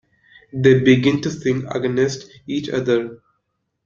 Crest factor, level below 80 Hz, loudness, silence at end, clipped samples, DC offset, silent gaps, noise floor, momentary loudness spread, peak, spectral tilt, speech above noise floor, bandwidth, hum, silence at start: 18 dB; -54 dBFS; -18 LUFS; 0.7 s; under 0.1%; under 0.1%; none; -73 dBFS; 14 LU; -2 dBFS; -6.5 dB/octave; 55 dB; 7.6 kHz; none; 0.55 s